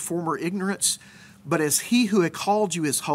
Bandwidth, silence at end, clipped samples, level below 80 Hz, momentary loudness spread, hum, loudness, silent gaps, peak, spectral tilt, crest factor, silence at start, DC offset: 16 kHz; 0 s; under 0.1%; -68 dBFS; 7 LU; none; -23 LUFS; none; -8 dBFS; -3.5 dB/octave; 16 dB; 0 s; under 0.1%